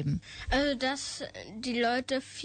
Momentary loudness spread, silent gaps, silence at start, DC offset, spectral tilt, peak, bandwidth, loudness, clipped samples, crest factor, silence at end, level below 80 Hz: 10 LU; none; 0 s; under 0.1%; -4.5 dB/octave; -16 dBFS; 9.4 kHz; -31 LUFS; under 0.1%; 16 dB; 0 s; -46 dBFS